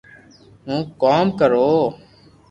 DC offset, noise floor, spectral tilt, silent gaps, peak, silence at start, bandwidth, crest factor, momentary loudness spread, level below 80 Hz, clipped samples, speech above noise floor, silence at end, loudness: under 0.1%; -48 dBFS; -7.5 dB/octave; none; -4 dBFS; 0.65 s; 7.8 kHz; 16 dB; 10 LU; -56 dBFS; under 0.1%; 31 dB; 0.55 s; -18 LUFS